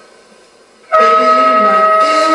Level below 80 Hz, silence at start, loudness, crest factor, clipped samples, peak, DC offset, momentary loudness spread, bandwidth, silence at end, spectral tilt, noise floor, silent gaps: -62 dBFS; 0.9 s; -9 LUFS; 10 dB; under 0.1%; 0 dBFS; under 0.1%; 2 LU; 11.5 kHz; 0 s; -3 dB/octave; -44 dBFS; none